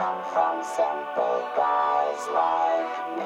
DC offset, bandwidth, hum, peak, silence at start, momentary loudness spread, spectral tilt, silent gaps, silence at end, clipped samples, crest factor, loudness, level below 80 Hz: under 0.1%; 13 kHz; none; -10 dBFS; 0 s; 4 LU; -3.5 dB/octave; none; 0 s; under 0.1%; 14 dB; -25 LUFS; -72 dBFS